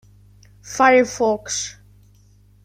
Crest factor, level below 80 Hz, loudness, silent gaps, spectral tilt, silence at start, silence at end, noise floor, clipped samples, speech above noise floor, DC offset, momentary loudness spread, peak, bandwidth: 20 dB; -54 dBFS; -18 LUFS; none; -2.5 dB/octave; 0.65 s; 0.95 s; -52 dBFS; under 0.1%; 34 dB; under 0.1%; 16 LU; -2 dBFS; 15.5 kHz